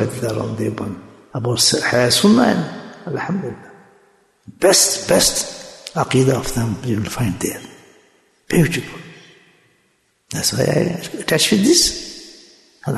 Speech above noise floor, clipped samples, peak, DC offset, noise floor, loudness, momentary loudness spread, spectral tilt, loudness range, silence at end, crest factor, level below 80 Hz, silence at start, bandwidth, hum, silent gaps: 45 dB; under 0.1%; -2 dBFS; under 0.1%; -62 dBFS; -17 LUFS; 19 LU; -3.5 dB/octave; 6 LU; 0 s; 18 dB; -44 dBFS; 0 s; 12.5 kHz; none; none